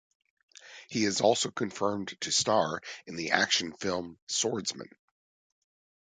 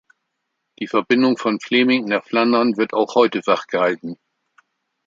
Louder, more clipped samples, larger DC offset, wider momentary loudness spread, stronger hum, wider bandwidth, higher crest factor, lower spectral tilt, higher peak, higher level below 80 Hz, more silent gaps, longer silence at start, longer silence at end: second, -29 LUFS vs -18 LUFS; neither; neither; first, 14 LU vs 9 LU; neither; first, 10 kHz vs 7.6 kHz; first, 28 dB vs 18 dB; second, -2.5 dB/octave vs -5.5 dB/octave; about the same, -4 dBFS vs -2 dBFS; about the same, -68 dBFS vs -70 dBFS; first, 4.22-4.27 s vs none; second, 0.65 s vs 0.8 s; first, 1.2 s vs 0.9 s